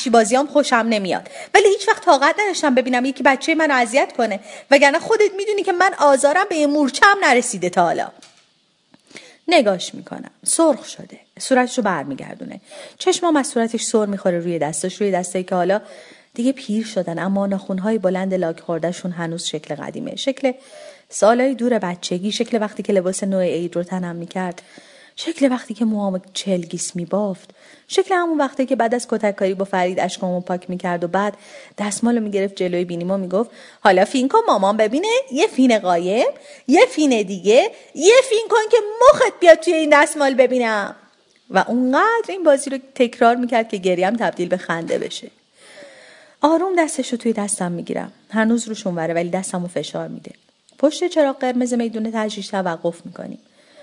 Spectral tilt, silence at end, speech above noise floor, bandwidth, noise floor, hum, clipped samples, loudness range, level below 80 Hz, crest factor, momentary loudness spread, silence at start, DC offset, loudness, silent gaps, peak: -4 dB/octave; 0.45 s; 42 dB; 11 kHz; -61 dBFS; none; under 0.1%; 7 LU; -64 dBFS; 18 dB; 12 LU; 0 s; under 0.1%; -18 LUFS; none; 0 dBFS